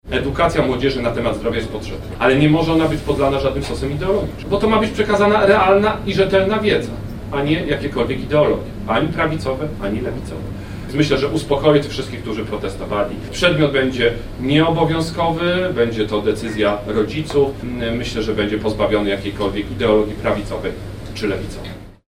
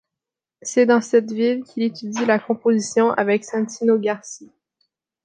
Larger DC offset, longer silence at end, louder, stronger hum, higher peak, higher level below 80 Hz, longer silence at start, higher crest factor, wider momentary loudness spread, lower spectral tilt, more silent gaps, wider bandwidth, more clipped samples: neither; second, 0.1 s vs 0.8 s; about the same, -18 LUFS vs -20 LUFS; neither; about the same, -2 dBFS vs -4 dBFS; first, -34 dBFS vs -74 dBFS; second, 0.05 s vs 0.65 s; about the same, 16 dB vs 18 dB; about the same, 11 LU vs 9 LU; first, -6 dB/octave vs -4.5 dB/octave; neither; first, 15.5 kHz vs 9.6 kHz; neither